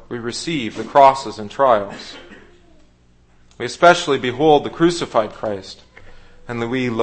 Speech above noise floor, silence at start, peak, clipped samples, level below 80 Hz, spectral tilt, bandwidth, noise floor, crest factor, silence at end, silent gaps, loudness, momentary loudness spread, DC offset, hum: 35 dB; 0.1 s; 0 dBFS; under 0.1%; -46 dBFS; -5 dB/octave; 8.8 kHz; -52 dBFS; 18 dB; 0 s; none; -17 LUFS; 18 LU; under 0.1%; 60 Hz at -55 dBFS